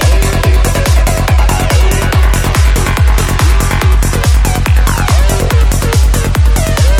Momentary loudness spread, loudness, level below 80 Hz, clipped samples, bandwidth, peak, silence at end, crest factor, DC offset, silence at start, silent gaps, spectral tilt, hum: 0 LU; -11 LUFS; -10 dBFS; under 0.1%; 17 kHz; 0 dBFS; 0 s; 8 dB; under 0.1%; 0 s; none; -5 dB/octave; none